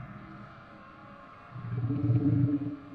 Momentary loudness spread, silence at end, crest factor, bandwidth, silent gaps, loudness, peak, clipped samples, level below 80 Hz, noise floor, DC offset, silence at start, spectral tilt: 23 LU; 0 s; 16 dB; 4.6 kHz; none; -29 LUFS; -16 dBFS; under 0.1%; -56 dBFS; -50 dBFS; under 0.1%; 0 s; -11.5 dB/octave